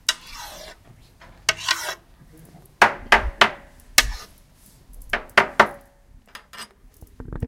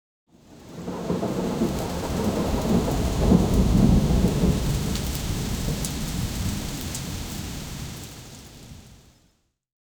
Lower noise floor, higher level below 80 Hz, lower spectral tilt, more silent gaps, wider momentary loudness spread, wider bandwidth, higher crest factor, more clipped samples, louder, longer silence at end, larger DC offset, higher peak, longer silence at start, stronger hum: second, -52 dBFS vs -66 dBFS; second, -40 dBFS vs -32 dBFS; second, -1.5 dB/octave vs -6 dB/octave; neither; first, 22 LU vs 18 LU; second, 17 kHz vs over 20 kHz; about the same, 24 dB vs 20 dB; neither; first, -20 LUFS vs -25 LUFS; second, 0 s vs 1.05 s; neither; first, 0 dBFS vs -4 dBFS; second, 0.1 s vs 0.5 s; neither